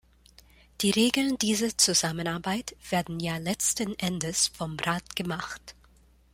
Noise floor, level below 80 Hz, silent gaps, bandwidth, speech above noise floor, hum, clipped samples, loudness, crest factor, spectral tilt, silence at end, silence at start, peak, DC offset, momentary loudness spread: -59 dBFS; -56 dBFS; none; 16.5 kHz; 31 dB; none; under 0.1%; -27 LUFS; 22 dB; -3 dB/octave; 0.6 s; 0.8 s; -8 dBFS; under 0.1%; 10 LU